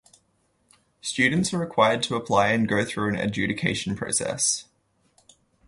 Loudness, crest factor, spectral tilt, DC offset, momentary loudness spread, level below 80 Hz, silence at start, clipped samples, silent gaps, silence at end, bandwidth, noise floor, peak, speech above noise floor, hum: -24 LUFS; 20 dB; -3.5 dB/octave; under 0.1%; 6 LU; -56 dBFS; 1.05 s; under 0.1%; none; 1.05 s; 11.5 kHz; -68 dBFS; -6 dBFS; 44 dB; none